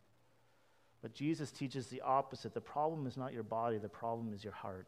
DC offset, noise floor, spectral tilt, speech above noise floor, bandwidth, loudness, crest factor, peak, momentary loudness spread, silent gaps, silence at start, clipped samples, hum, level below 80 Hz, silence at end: under 0.1%; -73 dBFS; -6.5 dB/octave; 33 dB; 15 kHz; -41 LUFS; 20 dB; -22 dBFS; 10 LU; none; 1.05 s; under 0.1%; none; -78 dBFS; 0.05 s